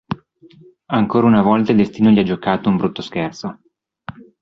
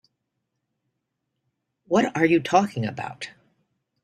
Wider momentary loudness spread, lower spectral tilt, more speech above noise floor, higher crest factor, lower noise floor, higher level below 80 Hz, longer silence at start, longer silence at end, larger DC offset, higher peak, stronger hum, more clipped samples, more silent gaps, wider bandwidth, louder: first, 20 LU vs 16 LU; first, -8 dB/octave vs -6 dB/octave; second, 21 dB vs 57 dB; second, 16 dB vs 22 dB; second, -37 dBFS vs -79 dBFS; first, -50 dBFS vs -66 dBFS; second, 0.1 s vs 1.9 s; second, 0.3 s vs 0.75 s; neither; about the same, -2 dBFS vs -4 dBFS; neither; neither; neither; second, 6.6 kHz vs 12.5 kHz; first, -16 LUFS vs -22 LUFS